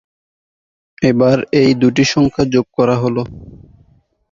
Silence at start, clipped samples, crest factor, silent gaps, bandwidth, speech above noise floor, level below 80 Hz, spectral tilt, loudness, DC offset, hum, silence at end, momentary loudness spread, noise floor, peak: 1 s; under 0.1%; 14 dB; none; 7.6 kHz; 39 dB; -44 dBFS; -6 dB/octave; -14 LUFS; under 0.1%; none; 0.75 s; 6 LU; -53 dBFS; 0 dBFS